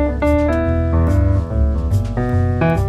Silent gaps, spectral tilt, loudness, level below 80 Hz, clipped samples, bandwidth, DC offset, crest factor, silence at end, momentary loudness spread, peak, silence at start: none; -9 dB/octave; -17 LUFS; -20 dBFS; under 0.1%; 8.6 kHz; under 0.1%; 12 dB; 0 s; 3 LU; -4 dBFS; 0 s